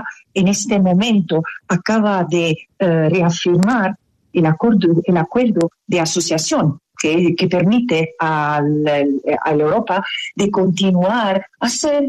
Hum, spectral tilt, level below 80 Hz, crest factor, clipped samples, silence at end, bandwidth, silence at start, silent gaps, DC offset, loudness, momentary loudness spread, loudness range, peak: none; -5.5 dB/octave; -54 dBFS; 12 dB; under 0.1%; 0 s; 13 kHz; 0 s; none; under 0.1%; -16 LUFS; 6 LU; 1 LU; -4 dBFS